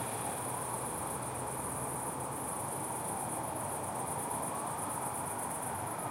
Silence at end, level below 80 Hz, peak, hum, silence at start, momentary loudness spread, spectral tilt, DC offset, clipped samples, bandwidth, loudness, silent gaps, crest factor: 0 s; -62 dBFS; -24 dBFS; none; 0 s; 1 LU; -3.5 dB/octave; under 0.1%; under 0.1%; 16 kHz; -37 LUFS; none; 14 dB